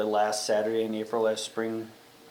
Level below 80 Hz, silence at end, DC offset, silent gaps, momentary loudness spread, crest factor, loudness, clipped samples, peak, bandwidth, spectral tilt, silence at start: -80 dBFS; 0 s; under 0.1%; none; 8 LU; 14 dB; -29 LUFS; under 0.1%; -14 dBFS; 20 kHz; -3.5 dB/octave; 0 s